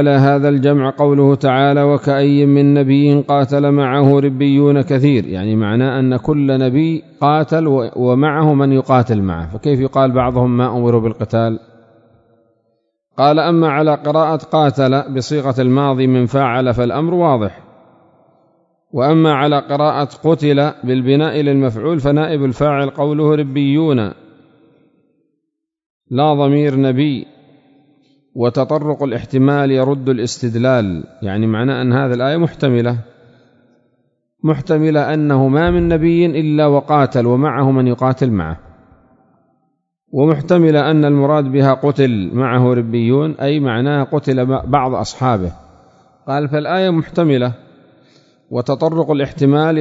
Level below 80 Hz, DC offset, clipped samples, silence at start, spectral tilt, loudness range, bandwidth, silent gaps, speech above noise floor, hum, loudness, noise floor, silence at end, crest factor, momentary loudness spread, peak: -42 dBFS; under 0.1%; under 0.1%; 0 s; -8 dB/octave; 6 LU; 7.8 kHz; 25.86-26.01 s; 61 dB; none; -14 LUFS; -74 dBFS; 0 s; 14 dB; 7 LU; 0 dBFS